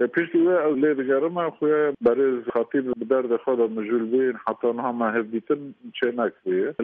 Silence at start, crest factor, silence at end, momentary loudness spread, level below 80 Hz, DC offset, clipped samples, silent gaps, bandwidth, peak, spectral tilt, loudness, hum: 0 s; 14 dB; 0 s; 6 LU; -68 dBFS; under 0.1%; under 0.1%; none; 3.8 kHz; -8 dBFS; -5 dB/octave; -23 LUFS; none